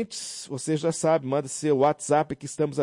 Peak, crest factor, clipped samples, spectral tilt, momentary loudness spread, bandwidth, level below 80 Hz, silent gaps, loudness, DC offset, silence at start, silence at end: -10 dBFS; 14 dB; under 0.1%; -5 dB/octave; 10 LU; 11.5 kHz; -66 dBFS; none; -26 LUFS; under 0.1%; 0 s; 0 s